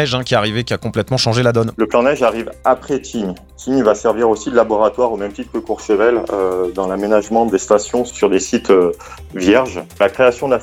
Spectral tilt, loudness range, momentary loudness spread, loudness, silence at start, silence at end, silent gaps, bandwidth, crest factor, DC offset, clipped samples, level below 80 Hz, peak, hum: -5 dB/octave; 1 LU; 9 LU; -16 LUFS; 0 s; 0 s; none; 16 kHz; 16 dB; under 0.1%; under 0.1%; -42 dBFS; 0 dBFS; none